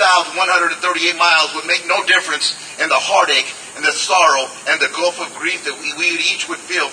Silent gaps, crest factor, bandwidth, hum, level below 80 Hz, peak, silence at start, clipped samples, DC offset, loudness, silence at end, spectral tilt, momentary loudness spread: none; 16 dB; 10.5 kHz; none; -66 dBFS; 0 dBFS; 0 s; under 0.1%; under 0.1%; -15 LUFS; 0 s; 0.5 dB/octave; 8 LU